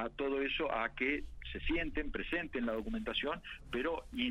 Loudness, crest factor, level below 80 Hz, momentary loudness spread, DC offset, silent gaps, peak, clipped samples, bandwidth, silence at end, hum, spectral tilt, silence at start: -37 LUFS; 16 dB; -48 dBFS; 6 LU; under 0.1%; none; -20 dBFS; under 0.1%; 12 kHz; 0 s; none; -6 dB/octave; 0 s